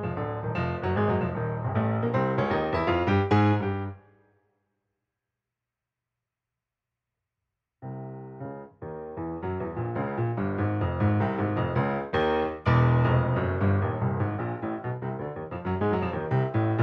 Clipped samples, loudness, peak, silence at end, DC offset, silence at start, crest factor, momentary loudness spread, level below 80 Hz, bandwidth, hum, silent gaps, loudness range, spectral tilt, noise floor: under 0.1%; -27 LUFS; -10 dBFS; 0 s; under 0.1%; 0 s; 18 dB; 16 LU; -50 dBFS; 6 kHz; none; none; 17 LU; -9.5 dB/octave; -88 dBFS